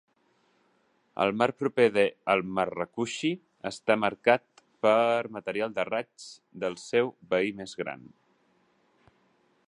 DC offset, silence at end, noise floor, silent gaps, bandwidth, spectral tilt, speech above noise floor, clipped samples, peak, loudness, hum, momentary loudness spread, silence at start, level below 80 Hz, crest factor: under 0.1%; 1.65 s; -69 dBFS; none; 11 kHz; -5 dB/octave; 42 dB; under 0.1%; -6 dBFS; -28 LUFS; none; 13 LU; 1.15 s; -70 dBFS; 24 dB